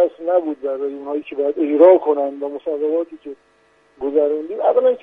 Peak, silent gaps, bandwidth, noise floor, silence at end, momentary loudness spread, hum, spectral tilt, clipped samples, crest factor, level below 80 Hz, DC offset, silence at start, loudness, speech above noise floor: 0 dBFS; none; 3.8 kHz; -56 dBFS; 0.05 s; 15 LU; none; -7 dB/octave; under 0.1%; 18 dB; -66 dBFS; under 0.1%; 0 s; -18 LUFS; 38 dB